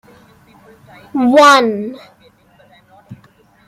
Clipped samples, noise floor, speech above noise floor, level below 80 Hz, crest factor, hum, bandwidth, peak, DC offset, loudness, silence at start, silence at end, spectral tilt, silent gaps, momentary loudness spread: under 0.1%; -49 dBFS; 38 dB; -60 dBFS; 16 dB; none; 16 kHz; 0 dBFS; under 0.1%; -11 LUFS; 1.15 s; 0.55 s; -3.5 dB/octave; none; 17 LU